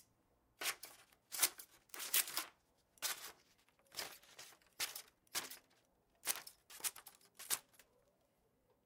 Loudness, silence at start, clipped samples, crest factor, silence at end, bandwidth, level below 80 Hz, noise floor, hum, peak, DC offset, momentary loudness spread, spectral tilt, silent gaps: -42 LUFS; 0.6 s; under 0.1%; 32 dB; 1.25 s; 18 kHz; -86 dBFS; -78 dBFS; none; -16 dBFS; under 0.1%; 20 LU; 2 dB/octave; none